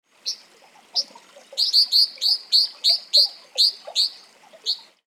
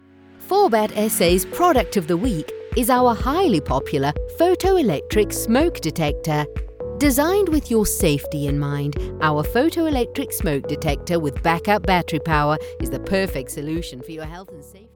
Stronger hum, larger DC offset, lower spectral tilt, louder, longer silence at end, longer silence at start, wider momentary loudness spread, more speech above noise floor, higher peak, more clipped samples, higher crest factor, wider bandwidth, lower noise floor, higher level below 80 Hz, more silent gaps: neither; neither; second, 3.5 dB/octave vs -5 dB/octave; about the same, -18 LUFS vs -20 LUFS; about the same, 0.3 s vs 0.2 s; second, 0.25 s vs 0.4 s; first, 14 LU vs 10 LU; first, 32 dB vs 23 dB; about the same, -4 dBFS vs -4 dBFS; neither; about the same, 18 dB vs 16 dB; second, 16 kHz vs 19 kHz; first, -52 dBFS vs -43 dBFS; second, under -90 dBFS vs -34 dBFS; neither